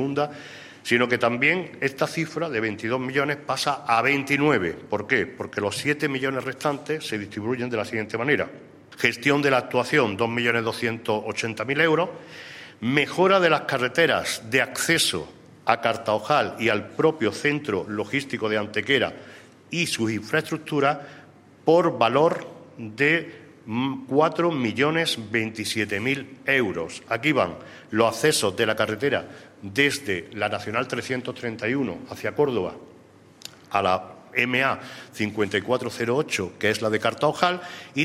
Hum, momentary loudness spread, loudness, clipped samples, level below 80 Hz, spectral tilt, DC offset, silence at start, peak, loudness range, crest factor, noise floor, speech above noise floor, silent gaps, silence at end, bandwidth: none; 10 LU; -24 LUFS; under 0.1%; -64 dBFS; -4.5 dB/octave; under 0.1%; 0 s; -2 dBFS; 4 LU; 24 dB; -51 dBFS; 27 dB; none; 0 s; 16 kHz